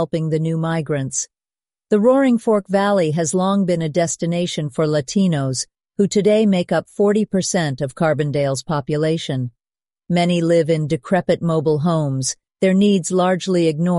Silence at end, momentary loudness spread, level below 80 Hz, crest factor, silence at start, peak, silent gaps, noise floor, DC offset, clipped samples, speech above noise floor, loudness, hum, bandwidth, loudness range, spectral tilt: 0 s; 7 LU; -56 dBFS; 14 dB; 0 s; -4 dBFS; none; under -90 dBFS; under 0.1%; under 0.1%; over 72 dB; -18 LUFS; none; 11.5 kHz; 2 LU; -5.5 dB/octave